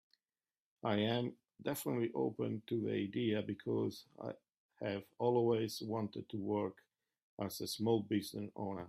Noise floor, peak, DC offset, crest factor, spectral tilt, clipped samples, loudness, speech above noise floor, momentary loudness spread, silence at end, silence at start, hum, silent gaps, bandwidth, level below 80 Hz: under -90 dBFS; -20 dBFS; under 0.1%; 18 dB; -6 dB/octave; under 0.1%; -39 LUFS; over 52 dB; 10 LU; 0 s; 0.85 s; none; 4.57-4.69 s, 7.23-7.37 s; 15.5 kHz; -78 dBFS